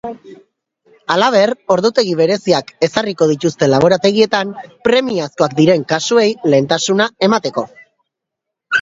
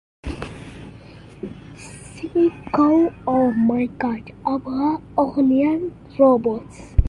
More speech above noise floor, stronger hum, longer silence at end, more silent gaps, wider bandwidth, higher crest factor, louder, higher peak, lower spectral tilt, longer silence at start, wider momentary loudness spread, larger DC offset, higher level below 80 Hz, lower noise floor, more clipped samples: first, 66 dB vs 23 dB; neither; about the same, 0 s vs 0 s; neither; second, 7.8 kHz vs 11 kHz; about the same, 14 dB vs 18 dB; first, -14 LUFS vs -20 LUFS; about the same, 0 dBFS vs -2 dBFS; second, -4.5 dB/octave vs -8 dB/octave; second, 0.05 s vs 0.25 s; second, 8 LU vs 21 LU; neither; second, -56 dBFS vs -34 dBFS; first, -80 dBFS vs -42 dBFS; neither